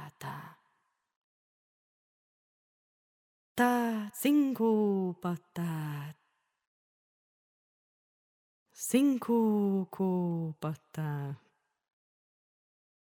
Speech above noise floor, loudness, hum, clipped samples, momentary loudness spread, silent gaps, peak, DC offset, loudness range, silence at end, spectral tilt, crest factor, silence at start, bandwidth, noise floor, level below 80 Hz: 48 dB; -31 LUFS; none; under 0.1%; 15 LU; 1.16-3.55 s, 6.67-8.66 s; -14 dBFS; under 0.1%; 12 LU; 1.7 s; -6.5 dB/octave; 20 dB; 0 s; 18 kHz; -78 dBFS; -80 dBFS